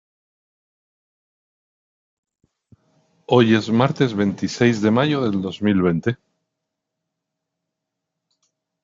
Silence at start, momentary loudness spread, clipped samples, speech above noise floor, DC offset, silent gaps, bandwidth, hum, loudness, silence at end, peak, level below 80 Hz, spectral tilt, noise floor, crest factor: 3.3 s; 7 LU; under 0.1%; 63 dB; under 0.1%; none; 7.6 kHz; none; -19 LUFS; 2.7 s; -2 dBFS; -64 dBFS; -5.5 dB/octave; -81 dBFS; 20 dB